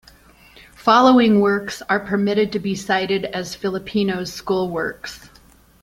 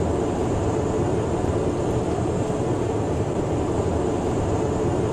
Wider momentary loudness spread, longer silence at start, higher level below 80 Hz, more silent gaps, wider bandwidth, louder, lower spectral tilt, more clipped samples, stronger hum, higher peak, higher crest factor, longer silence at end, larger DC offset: first, 13 LU vs 1 LU; first, 0.8 s vs 0 s; second, -52 dBFS vs -36 dBFS; neither; first, 16 kHz vs 11.5 kHz; first, -19 LUFS vs -24 LUFS; second, -5.5 dB/octave vs -7.5 dB/octave; neither; neither; first, -2 dBFS vs -10 dBFS; first, 18 dB vs 12 dB; first, 0.65 s vs 0 s; neither